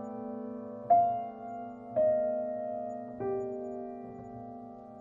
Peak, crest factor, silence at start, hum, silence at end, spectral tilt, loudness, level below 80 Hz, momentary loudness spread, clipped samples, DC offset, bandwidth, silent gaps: -14 dBFS; 20 dB; 0 s; none; 0 s; -9.5 dB/octave; -33 LUFS; -70 dBFS; 18 LU; under 0.1%; under 0.1%; 7.2 kHz; none